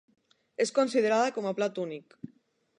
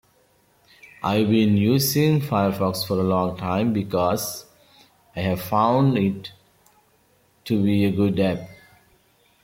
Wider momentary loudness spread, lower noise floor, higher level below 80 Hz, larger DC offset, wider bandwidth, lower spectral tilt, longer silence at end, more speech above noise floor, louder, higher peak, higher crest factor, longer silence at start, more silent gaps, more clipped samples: first, 23 LU vs 13 LU; first, -66 dBFS vs -61 dBFS; second, -82 dBFS vs -58 dBFS; neither; second, 11 kHz vs 16.5 kHz; second, -4 dB/octave vs -6 dB/octave; about the same, 0.8 s vs 0.9 s; about the same, 38 dB vs 40 dB; second, -28 LUFS vs -21 LUFS; second, -14 dBFS vs -6 dBFS; about the same, 16 dB vs 16 dB; second, 0.6 s vs 1 s; neither; neither